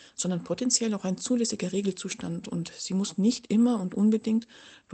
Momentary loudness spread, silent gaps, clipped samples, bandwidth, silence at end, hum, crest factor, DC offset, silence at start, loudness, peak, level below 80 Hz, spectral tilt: 9 LU; none; under 0.1%; 9.2 kHz; 0 s; none; 20 dB; under 0.1%; 0.2 s; -28 LUFS; -8 dBFS; -68 dBFS; -4.5 dB/octave